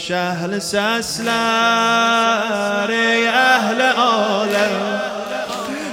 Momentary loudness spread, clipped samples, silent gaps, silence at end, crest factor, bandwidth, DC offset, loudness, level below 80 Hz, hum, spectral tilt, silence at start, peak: 9 LU; under 0.1%; none; 0 s; 16 dB; 17 kHz; under 0.1%; -17 LUFS; -58 dBFS; none; -3 dB/octave; 0 s; 0 dBFS